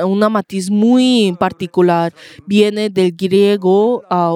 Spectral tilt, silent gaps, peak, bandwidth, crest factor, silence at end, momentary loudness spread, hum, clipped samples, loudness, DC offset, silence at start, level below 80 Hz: -6 dB/octave; none; 0 dBFS; 14.5 kHz; 12 dB; 0 s; 6 LU; none; under 0.1%; -14 LUFS; under 0.1%; 0 s; -60 dBFS